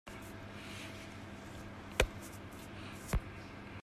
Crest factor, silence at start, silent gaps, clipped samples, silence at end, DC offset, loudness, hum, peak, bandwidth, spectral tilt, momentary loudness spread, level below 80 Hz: 32 dB; 0.05 s; none; under 0.1%; 0 s; under 0.1%; -43 LUFS; none; -10 dBFS; 15.5 kHz; -4 dB/octave; 13 LU; -48 dBFS